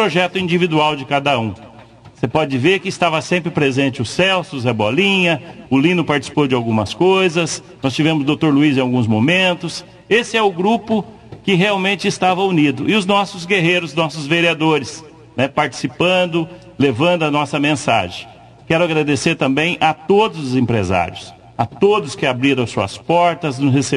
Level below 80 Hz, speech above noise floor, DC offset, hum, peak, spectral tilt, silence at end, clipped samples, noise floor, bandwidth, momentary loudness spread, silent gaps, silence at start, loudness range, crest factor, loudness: -48 dBFS; 25 dB; under 0.1%; none; -2 dBFS; -5 dB/octave; 0 s; under 0.1%; -41 dBFS; 12 kHz; 8 LU; none; 0 s; 2 LU; 16 dB; -16 LUFS